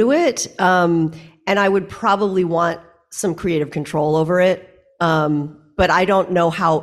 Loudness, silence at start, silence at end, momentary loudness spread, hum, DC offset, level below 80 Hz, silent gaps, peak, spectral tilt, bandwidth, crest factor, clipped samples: -18 LUFS; 0 s; 0 s; 9 LU; none; under 0.1%; -44 dBFS; none; -2 dBFS; -5.5 dB/octave; 13.5 kHz; 14 dB; under 0.1%